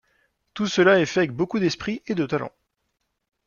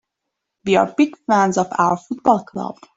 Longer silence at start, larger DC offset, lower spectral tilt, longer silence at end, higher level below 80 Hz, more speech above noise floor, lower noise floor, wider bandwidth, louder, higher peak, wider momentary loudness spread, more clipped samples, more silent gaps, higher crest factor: about the same, 0.55 s vs 0.65 s; neither; about the same, -5.5 dB/octave vs -5.5 dB/octave; first, 1 s vs 0.25 s; about the same, -60 dBFS vs -60 dBFS; second, 54 dB vs 61 dB; about the same, -76 dBFS vs -79 dBFS; second, 7.2 kHz vs 8 kHz; second, -22 LUFS vs -18 LUFS; about the same, -4 dBFS vs -2 dBFS; about the same, 12 LU vs 11 LU; neither; neither; about the same, 20 dB vs 16 dB